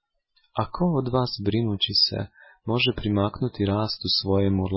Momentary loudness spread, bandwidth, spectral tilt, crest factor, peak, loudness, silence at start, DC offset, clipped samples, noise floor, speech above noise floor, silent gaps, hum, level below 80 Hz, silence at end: 10 LU; 5.8 kHz; -9 dB/octave; 16 dB; -10 dBFS; -24 LUFS; 0.55 s; under 0.1%; under 0.1%; -68 dBFS; 44 dB; none; none; -44 dBFS; 0 s